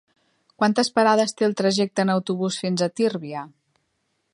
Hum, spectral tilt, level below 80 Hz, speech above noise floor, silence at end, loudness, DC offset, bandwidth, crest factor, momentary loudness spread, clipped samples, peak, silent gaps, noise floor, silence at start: none; -5 dB/octave; -72 dBFS; 51 dB; 0.85 s; -22 LUFS; under 0.1%; 11.5 kHz; 18 dB; 12 LU; under 0.1%; -4 dBFS; none; -73 dBFS; 0.6 s